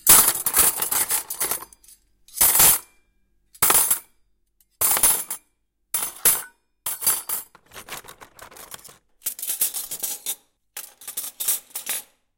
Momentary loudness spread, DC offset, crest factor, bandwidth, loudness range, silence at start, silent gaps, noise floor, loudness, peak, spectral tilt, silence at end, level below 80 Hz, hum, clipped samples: 22 LU; under 0.1%; 24 dB; 17 kHz; 10 LU; 0.05 s; none; -70 dBFS; -19 LUFS; 0 dBFS; 0.5 dB/octave; 0.35 s; -52 dBFS; none; under 0.1%